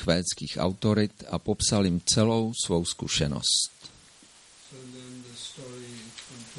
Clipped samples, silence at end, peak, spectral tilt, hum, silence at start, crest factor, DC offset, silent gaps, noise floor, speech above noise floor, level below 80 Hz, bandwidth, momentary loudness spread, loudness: under 0.1%; 0 s; -8 dBFS; -4 dB/octave; none; 0 s; 20 dB; under 0.1%; none; -54 dBFS; 28 dB; -50 dBFS; 11.5 kHz; 20 LU; -26 LUFS